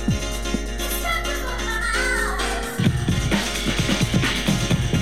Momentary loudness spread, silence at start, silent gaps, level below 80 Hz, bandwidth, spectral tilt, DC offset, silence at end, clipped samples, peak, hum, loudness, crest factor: 5 LU; 0 s; none; -30 dBFS; 16.5 kHz; -4 dB/octave; 0.8%; 0 s; under 0.1%; -6 dBFS; none; -22 LUFS; 16 dB